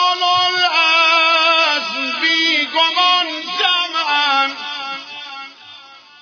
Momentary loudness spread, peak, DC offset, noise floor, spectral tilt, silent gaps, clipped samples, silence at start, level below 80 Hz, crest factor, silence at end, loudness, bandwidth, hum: 16 LU; -2 dBFS; under 0.1%; -41 dBFS; -0.5 dB/octave; none; under 0.1%; 0 s; -74 dBFS; 16 dB; 0.25 s; -14 LUFS; 5.4 kHz; none